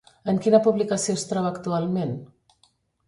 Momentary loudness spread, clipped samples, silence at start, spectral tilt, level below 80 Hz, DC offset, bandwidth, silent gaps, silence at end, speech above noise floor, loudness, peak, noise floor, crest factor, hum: 9 LU; under 0.1%; 0.25 s; -5.5 dB/octave; -64 dBFS; under 0.1%; 11.5 kHz; none; 0.8 s; 42 dB; -23 LUFS; -4 dBFS; -65 dBFS; 20 dB; none